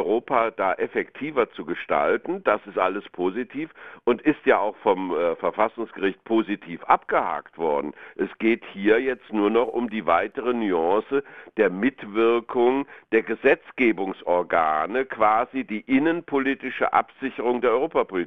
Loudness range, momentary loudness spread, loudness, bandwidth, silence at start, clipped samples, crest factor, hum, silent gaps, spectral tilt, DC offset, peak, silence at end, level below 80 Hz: 3 LU; 7 LU; -24 LUFS; 4.4 kHz; 0 s; under 0.1%; 22 dB; none; none; -8 dB/octave; 0.2%; -2 dBFS; 0 s; -62 dBFS